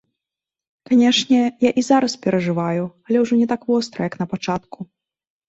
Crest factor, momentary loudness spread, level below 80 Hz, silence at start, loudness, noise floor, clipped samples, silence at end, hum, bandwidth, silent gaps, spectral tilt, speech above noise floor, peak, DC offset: 16 dB; 11 LU; -60 dBFS; 0.9 s; -19 LUFS; -87 dBFS; under 0.1%; 0.65 s; none; 8 kHz; none; -5 dB/octave; 69 dB; -2 dBFS; under 0.1%